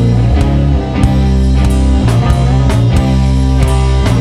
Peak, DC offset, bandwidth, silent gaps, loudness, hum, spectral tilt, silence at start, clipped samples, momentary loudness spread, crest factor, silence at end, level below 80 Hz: 0 dBFS; under 0.1%; 11.5 kHz; none; -11 LUFS; none; -7.5 dB/octave; 0 s; under 0.1%; 1 LU; 10 dB; 0 s; -12 dBFS